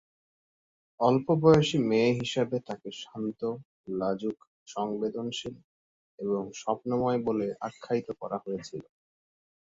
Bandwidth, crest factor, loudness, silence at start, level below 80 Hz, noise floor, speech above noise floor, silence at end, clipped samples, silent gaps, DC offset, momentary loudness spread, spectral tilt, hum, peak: 7.8 kHz; 22 dB; -29 LUFS; 1 s; -64 dBFS; under -90 dBFS; over 61 dB; 0.95 s; under 0.1%; 3.65-3.84 s, 4.47-4.66 s, 5.64-6.18 s; under 0.1%; 16 LU; -6.5 dB/octave; none; -6 dBFS